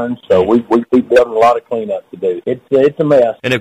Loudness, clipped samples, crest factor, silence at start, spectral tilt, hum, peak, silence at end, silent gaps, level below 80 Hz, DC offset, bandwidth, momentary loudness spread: -13 LUFS; under 0.1%; 10 dB; 0 s; -6.5 dB/octave; none; -2 dBFS; 0 s; none; -50 dBFS; under 0.1%; 13 kHz; 9 LU